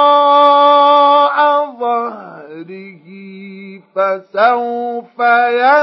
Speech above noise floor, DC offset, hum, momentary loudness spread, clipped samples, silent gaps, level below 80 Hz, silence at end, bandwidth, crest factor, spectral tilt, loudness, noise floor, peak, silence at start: 21 dB; under 0.1%; none; 24 LU; under 0.1%; none; -82 dBFS; 0 s; 5.8 kHz; 12 dB; -5.5 dB/octave; -11 LUFS; -34 dBFS; 0 dBFS; 0 s